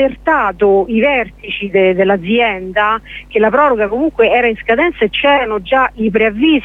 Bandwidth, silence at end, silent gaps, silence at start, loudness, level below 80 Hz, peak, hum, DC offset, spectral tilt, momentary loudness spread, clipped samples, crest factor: 4.1 kHz; 0 s; none; 0 s; -13 LUFS; -38 dBFS; 0 dBFS; none; under 0.1%; -7 dB/octave; 4 LU; under 0.1%; 12 dB